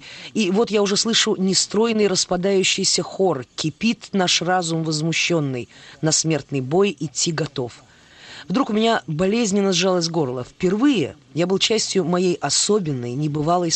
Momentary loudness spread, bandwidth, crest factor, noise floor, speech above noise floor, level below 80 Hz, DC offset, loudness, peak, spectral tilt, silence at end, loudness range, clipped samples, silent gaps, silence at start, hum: 8 LU; 9.2 kHz; 16 dB; -43 dBFS; 23 dB; -56 dBFS; under 0.1%; -20 LUFS; -4 dBFS; -3.5 dB/octave; 0 s; 3 LU; under 0.1%; none; 0 s; none